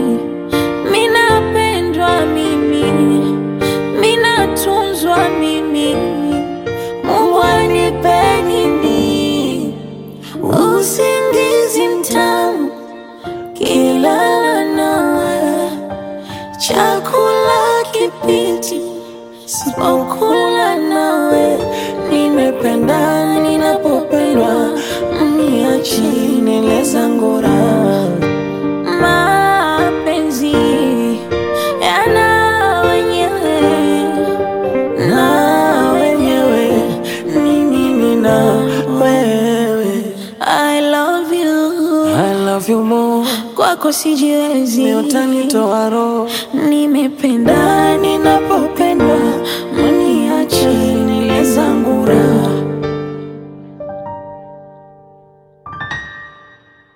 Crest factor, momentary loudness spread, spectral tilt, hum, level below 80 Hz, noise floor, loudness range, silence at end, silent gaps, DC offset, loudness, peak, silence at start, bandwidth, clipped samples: 14 dB; 9 LU; -4.5 dB/octave; none; -42 dBFS; -46 dBFS; 2 LU; 0.65 s; none; under 0.1%; -13 LUFS; 0 dBFS; 0 s; 17 kHz; under 0.1%